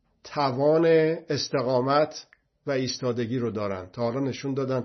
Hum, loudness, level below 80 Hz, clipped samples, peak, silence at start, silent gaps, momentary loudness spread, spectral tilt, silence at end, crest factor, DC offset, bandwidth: none; -26 LUFS; -68 dBFS; under 0.1%; -10 dBFS; 0.25 s; none; 10 LU; -6 dB/octave; 0 s; 16 dB; under 0.1%; 6.4 kHz